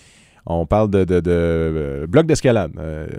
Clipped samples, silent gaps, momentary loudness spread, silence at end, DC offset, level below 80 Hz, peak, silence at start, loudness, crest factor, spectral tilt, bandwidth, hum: under 0.1%; none; 10 LU; 0 s; under 0.1%; -34 dBFS; 0 dBFS; 0.45 s; -18 LUFS; 18 dB; -7 dB/octave; 13 kHz; none